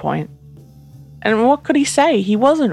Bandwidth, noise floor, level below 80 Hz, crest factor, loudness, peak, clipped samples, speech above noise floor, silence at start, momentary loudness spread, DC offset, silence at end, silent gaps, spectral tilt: 13 kHz; -41 dBFS; -52 dBFS; 16 dB; -16 LUFS; 0 dBFS; under 0.1%; 26 dB; 0 s; 10 LU; under 0.1%; 0 s; none; -5 dB/octave